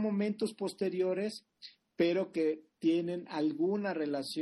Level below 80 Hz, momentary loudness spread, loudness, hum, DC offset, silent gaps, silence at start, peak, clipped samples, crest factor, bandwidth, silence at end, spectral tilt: -78 dBFS; 8 LU; -33 LUFS; none; under 0.1%; none; 0 s; -18 dBFS; under 0.1%; 14 dB; 12 kHz; 0 s; -6 dB/octave